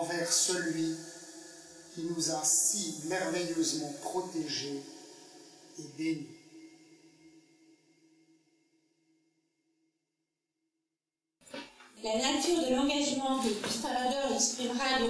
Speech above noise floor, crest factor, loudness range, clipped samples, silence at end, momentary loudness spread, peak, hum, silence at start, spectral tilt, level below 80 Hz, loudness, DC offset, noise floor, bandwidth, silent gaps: over 58 dB; 20 dB; 14 LU; under 0.1%; 0 s; 22 LU; -16 dBFS; none; 0 s; -2 dB/octave; -68 dBFS; -31 LUFS; under 0.1%; under -90 dBFS; 11 kHz; none